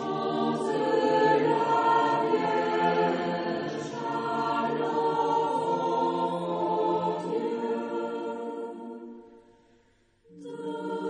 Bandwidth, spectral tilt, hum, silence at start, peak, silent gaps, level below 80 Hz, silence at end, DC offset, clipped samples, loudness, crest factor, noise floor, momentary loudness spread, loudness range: 10 kHz; -6 dB/octave; none; 0 s; -12 dBFS; none; -74 dBFS; 0 s; under 0.1%; under 0.1%; -27 LUFS; 16 dB; -65 dBFS; 13 LU; 10 LU